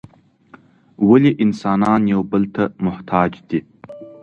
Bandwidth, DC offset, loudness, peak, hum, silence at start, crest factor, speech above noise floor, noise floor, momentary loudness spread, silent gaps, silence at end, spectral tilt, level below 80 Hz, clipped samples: 7.6 kHz; under 0.1%; -17 LUFS; 0 dBFS; none; 1 s; 18 dB; 32 dB; -48 dBFS; 12 LU; none; 0.1 s; -8.5 dB/octave; -50 dBFS; under 0.1%